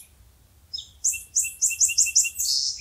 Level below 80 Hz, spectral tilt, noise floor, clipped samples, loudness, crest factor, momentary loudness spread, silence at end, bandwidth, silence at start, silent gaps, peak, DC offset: -58 dBFS; 4.5 dB/octave; -55 dBFS; under 0.1%; -21 LUFS; 20 dB; 17 LU; 0 s; 16 kHz; 0.75 s; none; -6 dBFS; under 0.1%